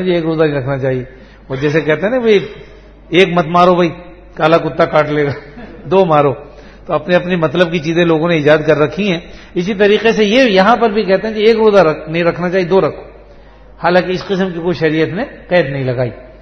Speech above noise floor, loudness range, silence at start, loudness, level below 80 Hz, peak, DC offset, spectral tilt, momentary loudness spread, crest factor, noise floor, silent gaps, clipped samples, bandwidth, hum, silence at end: 26 dB; 4 LU; 0 s; -13 LUFS; -42 dBFS; 0 dBFS; under 0.1%; -6.5 dB/octave; 11 LU; 14 dB; -38 dBFS; none; 0.1%; 7.6 kHz; none; 0.1 s